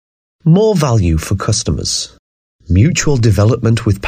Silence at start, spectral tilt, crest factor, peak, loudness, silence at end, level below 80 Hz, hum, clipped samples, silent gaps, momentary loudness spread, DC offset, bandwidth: 0.45 s; -5.5 dB/octave; 12 dB; 0 dBFS; -13 LUFS; 0 s; -28 dBFS; none; under 0.1%; 2.19-2.59 s; 6 LU; under 0.1%; 15 kHz